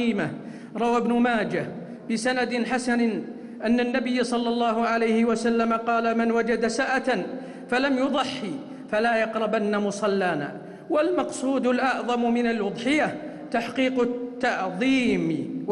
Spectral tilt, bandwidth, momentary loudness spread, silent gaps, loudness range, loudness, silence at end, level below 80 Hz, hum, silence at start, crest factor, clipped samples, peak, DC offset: -5 dB/octave; 11 kHz; 9 LU; none; 2 LU; -24 LUFS; 0 s; -60 dBFS; none; 0 s; 12 dB; under 0.1%; -14 dBFS; under 0.1%